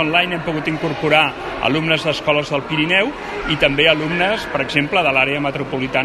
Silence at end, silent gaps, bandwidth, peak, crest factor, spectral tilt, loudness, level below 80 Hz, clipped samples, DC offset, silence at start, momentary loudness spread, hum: 0 s; none; 12.5 kHz; 0 dBFS; 18 dB; -5 dB/octave; -17 LUFS; -42 dBFS; under 0.1%; under 0.1%; 0 s; 7 LU; none